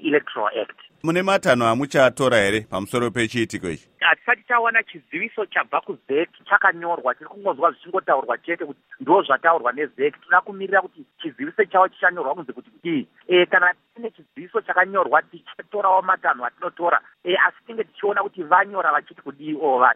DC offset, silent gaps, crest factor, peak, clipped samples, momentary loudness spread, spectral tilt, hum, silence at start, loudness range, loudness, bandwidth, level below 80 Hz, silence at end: under 0.1%; none; 20 dB; 0 dBFS; under 0.1%; 14 LU; -4.5 dB/octave; none; 0 s; 2 LU; -21 LUFS; 15.5 kHz; -62 dBFS; 0 s